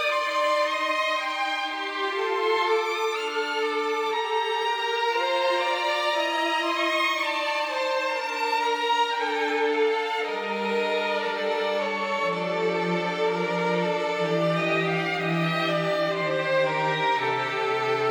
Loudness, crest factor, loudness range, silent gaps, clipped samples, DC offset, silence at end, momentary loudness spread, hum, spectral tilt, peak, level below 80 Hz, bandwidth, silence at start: -25 LUFS; 12 dB; 1 LU; none; under 0.1%; under 0.1%; 0 s; 3 LU; none; -4.5 dB/octave; -12 dBFS; -80 dBFS; over 20 kHz; 0 s